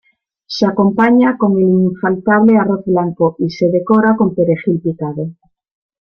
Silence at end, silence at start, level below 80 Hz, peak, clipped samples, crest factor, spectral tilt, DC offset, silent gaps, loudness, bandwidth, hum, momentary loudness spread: 0.7 s; 0.5 s; -54 dBFS; -2 dBFS; under 0.1%; 12 dB; -8 dB/octave; under 0.1%; none; -13 LUFS; 6.6 kHz; none; 10 LU